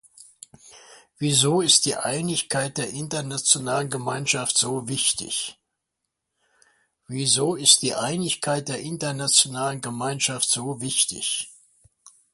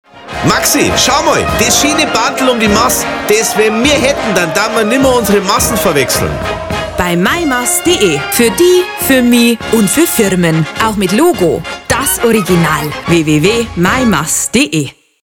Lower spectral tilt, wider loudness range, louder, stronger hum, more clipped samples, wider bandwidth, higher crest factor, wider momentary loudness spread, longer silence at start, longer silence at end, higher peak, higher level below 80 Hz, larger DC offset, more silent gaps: about the same, -2.5 dB/octave vs -3.5 dB/octave; about the same, 4 LU vs 2 LU; second, -22 LUFS vs -10 LUFS; neither; neither; second, 12 kHz vs 19.5 kHz; first, 24 dB vs 10 dB; first, 12 LU vs 5 LU; about the same, 0.2 s vs 0.15 s; first, 0.8 s vs 0.35 s; about the same, -2 dBFS vs 0 dBFS; second, -64 dBFS vs -32 dBFS; neither; neither